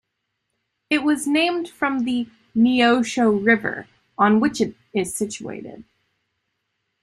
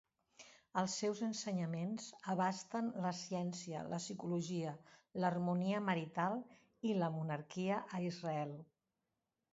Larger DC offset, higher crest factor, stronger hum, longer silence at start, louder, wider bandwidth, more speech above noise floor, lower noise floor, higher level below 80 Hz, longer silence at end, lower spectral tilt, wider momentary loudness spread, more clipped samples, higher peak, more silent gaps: neither; about the same, 18 dB vs 18 dB; neither; first, 0.9 s vs 0.4 s; first, -20 LUFS vs -41 LUFS; first, 13 kHz vs 7.6 kHz; first, 57 dB vs 49 dB; second, -77 dBFS vs -89 dBFS; first, -62 dBFS vs -82 dBFS; first, 1.2 s vs 0.9 s; about the same, -4.5 dB/octave vs -5.5 dB/octave; first, 15 LU vs 9 LU; neither; first, -2 dBFS vs -22 dBFS; neither